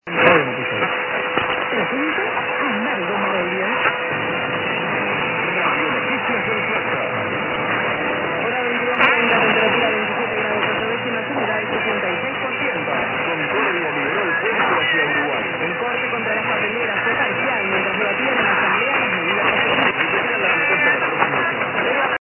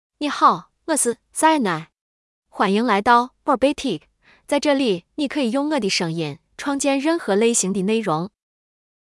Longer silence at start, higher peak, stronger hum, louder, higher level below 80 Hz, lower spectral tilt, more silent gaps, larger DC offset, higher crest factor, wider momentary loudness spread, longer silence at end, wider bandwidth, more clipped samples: second, 0.05 s vs 0.2 s; first, 0 dBFS vs -4 dBFS; neither; about the same, -18 LUFS vs -20 LUFS; about the same, -56 dBFS vs -58 dBFS; first, -8 dB/octave vs -4 dB/octave; second, none vs 2.01-2.43 s; neither; about the same, 18 dB vs 18 dB; second, 6 LU vs 10 LU; second, 0.05 s vs 0.85 s; second, 4.1 kHz vs 12 kHz; neither